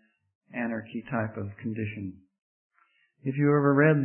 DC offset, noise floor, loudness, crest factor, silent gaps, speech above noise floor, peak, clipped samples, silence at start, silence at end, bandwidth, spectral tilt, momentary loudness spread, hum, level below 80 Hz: under 0.1%; -68 dBFS; -28 LUFS; 20 dB; 2.42-2.70 s; 42 dB; -8 dBFS; under 0.1%; 0.55 s; 0 s; 3.2 kHz; -12.5 dB/octave; 17 LU; none; -70 dBFS